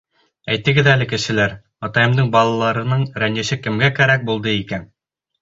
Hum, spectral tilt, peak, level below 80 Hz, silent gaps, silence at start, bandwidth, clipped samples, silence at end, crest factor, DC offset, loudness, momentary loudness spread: none; -5.5 dB/octave; -2 dBFS; -48 dBFS; none; 0.45 s; 7.8 kHz; under 0.1%; 0.55 s; 16 dB; under 0.1%; -17 LUFS; 9 LU